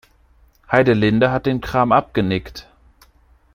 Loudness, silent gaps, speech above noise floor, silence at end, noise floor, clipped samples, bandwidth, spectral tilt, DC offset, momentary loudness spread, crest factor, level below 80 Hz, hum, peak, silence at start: -17 LUFS; none; 37 dB; 0.95 s; -54 dBFS; under 0.1%; 15.5 kHz; -7.5 dB/octave; under 0.1%; 10 LU; 18 dB; -44 dBFS; none; 0 dBFS; 0.7 s